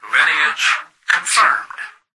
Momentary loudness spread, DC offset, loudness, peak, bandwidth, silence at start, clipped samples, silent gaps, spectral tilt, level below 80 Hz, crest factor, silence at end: 11 LU; under 0.1%; -15 LUFS; -2 dBFS; 12 kHz; 0.05 s; under 0.1%; none; 2.5 dB/octave; -68 dBFS; 16 dB; 0.25 s